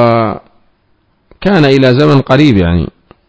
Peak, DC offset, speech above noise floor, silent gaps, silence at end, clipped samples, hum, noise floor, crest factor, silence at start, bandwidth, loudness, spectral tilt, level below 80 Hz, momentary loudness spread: 0 dBFS; under 0.1%; 48 dB; none; 0.45 s; 2%; none; -55 dBFS; 10 dB; 0 s; 8 kHz; -9 LUFS; -8 dB/octave; -28 dBFS; 10 LU